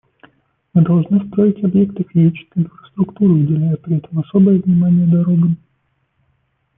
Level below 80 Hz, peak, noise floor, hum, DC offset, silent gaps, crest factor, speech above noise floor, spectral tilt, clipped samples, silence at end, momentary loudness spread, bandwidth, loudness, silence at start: -54 dBFS; -2 dBFS; -65 dBFS; none; under 0.1%; none; 14 dB; 51 dB; -14.5 dB/octave; under 0.1%; 1.2 s; 9 LU; 3.6 kHz; -15 LUFS; 0.75 s